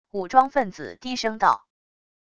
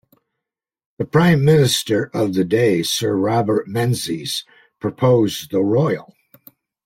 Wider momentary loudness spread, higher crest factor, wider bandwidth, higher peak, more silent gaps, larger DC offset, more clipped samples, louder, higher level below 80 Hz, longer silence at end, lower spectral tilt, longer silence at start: about the same, 12 LU vs 11 LU; first, 22 dB vs 16 dB; second, 8.4 kHz vs 16.5 kHz; about the same, -2 dBFS vs -2 dBFS; neither; first, 0.4% vs under 0.1%; neither; second, -23 LUFS vs -18 LUFS; about the same, -60 dBFS vs -56 dBFS; about the same, 0.8 s vs 0.85 s; second, -4 dB/octave vs -5.5 dB/octave; second, 0.15 s vs 1 s